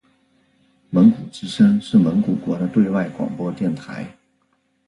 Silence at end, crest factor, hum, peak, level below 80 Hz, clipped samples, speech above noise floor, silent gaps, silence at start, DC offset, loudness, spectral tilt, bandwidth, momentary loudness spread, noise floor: 0.8 s; 18 dB; none; -2 dBFS; -56 dBFS; under 0.1%; 48 dB; none; 0.9 s; under 0.1%; -19 LUFS; -8 dB/octave; 10.5 kHz; 15 LU; -66 dBFS